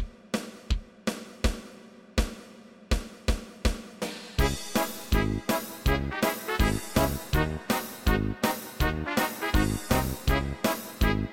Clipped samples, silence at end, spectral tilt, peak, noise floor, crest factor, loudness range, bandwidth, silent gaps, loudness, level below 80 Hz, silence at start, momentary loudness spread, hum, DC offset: under 0.1%; 0 s; -5 dB/octave; -10 dBFS; -49 dBFS; 18 dB; 5 LU; 17 kHz; none; -29 LUFS; -32 dBFS; 0 s; 7 LU; none; under 0.1%